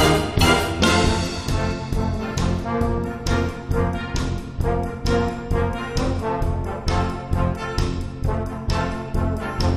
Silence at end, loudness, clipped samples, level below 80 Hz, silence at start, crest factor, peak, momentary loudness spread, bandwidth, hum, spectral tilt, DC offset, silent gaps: 0 s; -23 LUFS; under 0.1%; -28 dBFS; 0 s; 18 dB; -4 dBFS; 8 LU; 15.5 kHz; none; -5.5 dB/octave; under 0.1%; none